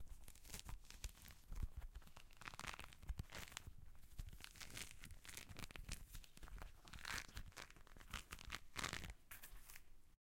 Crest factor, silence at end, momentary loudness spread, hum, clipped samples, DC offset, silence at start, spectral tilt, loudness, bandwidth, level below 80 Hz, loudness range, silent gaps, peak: 32 dB; 0.05 s; 13 LU; none; under 0.1%; under 0.1%; 0 s; -2.5 dB/octave; -55 LUFS; 16.5 kHz; -58 dBFS; 4 LU; none; -22 dBFS